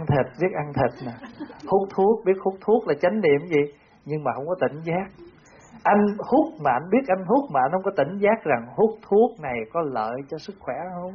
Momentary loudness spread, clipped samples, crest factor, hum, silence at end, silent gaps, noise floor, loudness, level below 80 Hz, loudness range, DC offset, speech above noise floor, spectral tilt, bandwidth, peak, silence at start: 12 LU; under 0.1%; 16 dB; none; 0 s; none; -49 dBFS; -23 LUFS; -56 dBFS; 3 LU; under 0.1%; 26 dB; -6.5 dB/octave; 6.8 kHz; -8 dBFS; 0 s